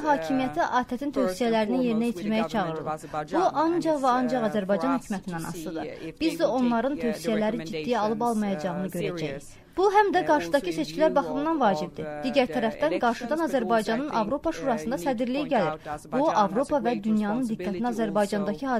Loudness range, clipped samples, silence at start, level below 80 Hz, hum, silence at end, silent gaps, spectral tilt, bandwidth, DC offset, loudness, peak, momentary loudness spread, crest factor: 2 LU; under 0.1%; 0 s; -54 dBFS; none; 0 s; none; -5.5 dB/octave; 15.5 kHz; under 0.1%; -26 LUFS; -8 dBFS; 8 LU; 18 dB